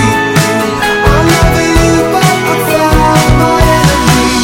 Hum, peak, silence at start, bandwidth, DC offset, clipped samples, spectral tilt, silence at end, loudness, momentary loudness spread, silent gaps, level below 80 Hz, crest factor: none; 0 dBFS; 0 s; 17.5 kHz; under 0.1%; 0.5%; -5 dB/octave; 0 s; -8 LUFS; 3 LU; none; -18 dBFS; 8 dB